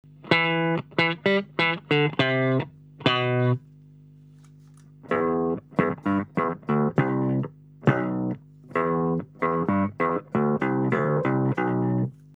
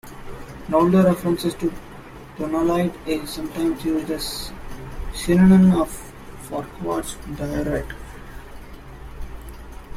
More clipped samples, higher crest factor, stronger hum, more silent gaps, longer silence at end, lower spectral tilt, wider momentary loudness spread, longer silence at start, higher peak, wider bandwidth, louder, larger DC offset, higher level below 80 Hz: neither; about the same, 20 dB vs 18 dB; first, 50 Hz at -45 dBFS vs none; neither; first, 0.3 s vs 0 s; first, -8 dB/octave vs -6.5 dB/octave; second, 6 LU vs 24 LU; first, 0.25 s vs 0.05 s; about the same, -4 dBFS vs -4 dBFS; second, 8 kHz vs 15.5 kHz; second, -25 LUFS vs -21 LUFS; neither; second, -62 dBFS vs -38 dBFS